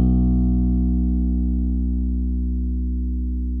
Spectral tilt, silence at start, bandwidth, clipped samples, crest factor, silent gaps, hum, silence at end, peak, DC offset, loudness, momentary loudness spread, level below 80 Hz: -14.5 dB/octave; 0 s; 1.2 kHz; under 0.1%; 10 dB; none; 60 Hz at -65 dBFS; 0 s; -10 dBFS; under 0.1%; -22 LUFS; 6 LU; -22 dBFS